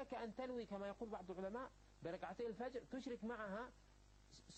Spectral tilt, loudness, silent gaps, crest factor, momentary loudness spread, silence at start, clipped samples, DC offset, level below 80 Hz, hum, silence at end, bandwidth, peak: -6 dB/octave; -50 LUFS; none; 14 dB; 9 LU; 0 s; under 0.1%; under 0.1%; -70 dBFS; 50 Hz at -70 dBFS; 0 s; 8.4 kHz; -36 dBFS